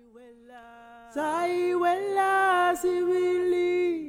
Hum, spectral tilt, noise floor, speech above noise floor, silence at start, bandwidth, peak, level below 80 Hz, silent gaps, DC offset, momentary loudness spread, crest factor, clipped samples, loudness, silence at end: none; -4 dB/octave; -51 dBFS; 26 dB; 0.15 s; 15.5 kHz; -14 dBFS; -66 dBFS; none; under 0.1%; 6 LU; 12 dB; under 0.1%; -25 LUFS; 0 s